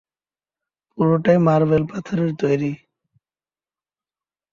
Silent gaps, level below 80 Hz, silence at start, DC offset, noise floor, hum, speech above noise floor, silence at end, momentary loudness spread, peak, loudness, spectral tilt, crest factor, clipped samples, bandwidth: none; -56 dBFS; 0.95 s; under 0.1%; under -90 dBFS; none; over 72 dB; 1.75 s; 10 LU; -2 dBFS; -19 LUFS; -9 dB/octave; 18 dB; under 0.1%; 7.2 kHz